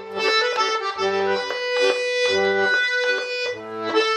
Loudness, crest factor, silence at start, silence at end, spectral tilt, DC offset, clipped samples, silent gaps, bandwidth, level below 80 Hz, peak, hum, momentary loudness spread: -21 LUFS; 16 dB; 0 s; 0 s; -2 dB/octave; under 0.1%; under 0.1%; none; 10 kHz; -70 dBFS; -6 dBFS; none; 5 LU